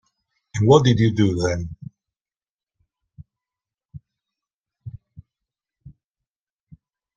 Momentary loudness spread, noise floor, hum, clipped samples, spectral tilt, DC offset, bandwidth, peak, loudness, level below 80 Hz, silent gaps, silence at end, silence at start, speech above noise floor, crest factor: 26 LU; under -90 dBFS; none; under 0.1%; -6.5 dB/octave; under 0.1%; 9 kHz; -2 dBFS; -19 LUFS; -52 dBFS; 2.21-2.25 s, 2.49-2.67 s, 3.85-3.89 s, 4.54-4.64 s; 1.25 s; 0.55 s; over 73 dB; 22 dB